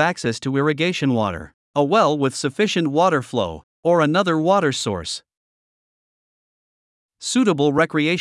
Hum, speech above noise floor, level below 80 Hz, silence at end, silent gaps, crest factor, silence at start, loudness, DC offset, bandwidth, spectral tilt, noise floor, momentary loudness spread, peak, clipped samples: none; over 71 dB; -58 dBFS; 0 s; 1.54-1.74 s, 3.63-3.83 s, 5.37-7.09 s; 18 dB; 0 s; -20 LUFS; under 0.1%; 12 kHz; -5 dB/octave; under -90 dBFS; 10 LU; -2 dBFS; under 0.1%